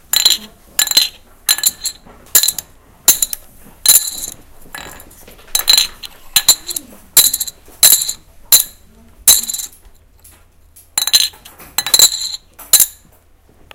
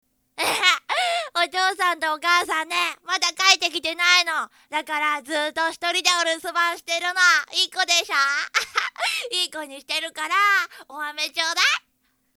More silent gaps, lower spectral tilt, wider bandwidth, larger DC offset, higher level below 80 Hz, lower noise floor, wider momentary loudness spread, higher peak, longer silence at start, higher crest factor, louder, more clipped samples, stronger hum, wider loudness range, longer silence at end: neither; about the same, 2.5 dB/octave vs 1.5 dB/octave; about the same, over 20 kHz vs over 20 kHz; neither; first, -44 dBFS vs -72 dBFS; second, -48 dBFS vs -69 dBFS; first, 16 LU vs 10 LU; about the same, 0 dBFS vs 0 dBFS; second, 0.15 s vs 0.35 s; second, 16 dB vs 24 dB; first, -11 LUFS vs -21 LUFS; first, 0.6% vs under 0.1%; neither; about the same, 3 LU vs 3 LU; first, 0.85 s vs 0.6 s